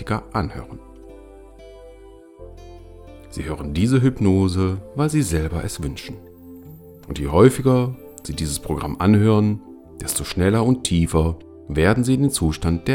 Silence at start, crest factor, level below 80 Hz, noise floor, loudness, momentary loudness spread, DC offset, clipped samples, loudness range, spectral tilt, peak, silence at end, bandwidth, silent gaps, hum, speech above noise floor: 0 s; 20 dB; -38 dBFS; -44 dBFS; -20 LUFS; 20 LU; under 0.1%; under 0.1%; 8 LU; -6 dB/octave; 0 dBFS; 0 s; 17 kHz; none; none; 25 dB